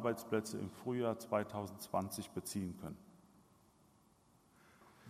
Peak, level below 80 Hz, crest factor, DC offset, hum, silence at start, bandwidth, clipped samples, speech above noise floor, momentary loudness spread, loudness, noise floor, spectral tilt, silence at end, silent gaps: -22 dBFS; -76 dBFS; 22 dB; under 0.1%; none; 0 s; 15.5 kHz; under 0.1%; 29 dB; 8 LU; -41 LUFS; -70 dBFS; -5.5 dB/octave; 0 s; none